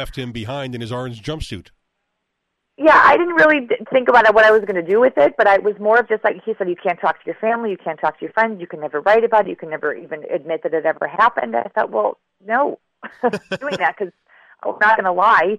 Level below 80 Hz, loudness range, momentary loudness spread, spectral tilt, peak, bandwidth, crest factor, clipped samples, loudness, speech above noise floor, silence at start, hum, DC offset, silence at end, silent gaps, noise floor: -48 dBFS; 7 LU; 15 LU; -6 dB/octave; -2 dBFS; 12 kHz; 14 dB; under 0.1%; -17 LUFS; 58 dB; 0 s; none; under 0.1%; 0 s; none; -75 dBFS